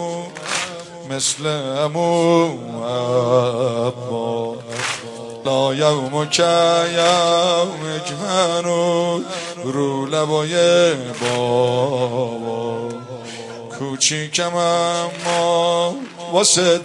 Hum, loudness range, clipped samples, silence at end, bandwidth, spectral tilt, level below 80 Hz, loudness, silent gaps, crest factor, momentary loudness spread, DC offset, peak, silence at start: none; 4 LU; under 0.1%; 0 s; 11.5 kHz; -3.5 dB/octave; -64 dBFS; -18 LUFS; none; 18 dB; 12 LU; under 0.1%; -2 dBFS; 0 s